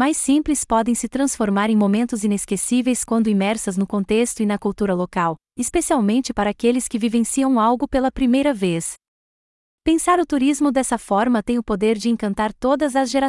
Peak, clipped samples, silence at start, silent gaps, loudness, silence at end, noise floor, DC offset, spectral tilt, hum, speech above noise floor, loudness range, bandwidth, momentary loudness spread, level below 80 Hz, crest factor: -6 dBFS; under 0.1%; 0 s; 9.08-9.78 s; -20 LUFS; 0 s; under -90 dBFS; under 0.1%; -4.5 dB/octave; none; over 71 dB; 1 LU; 12 kHz; 5 LU; -44 dBFS; 14 dB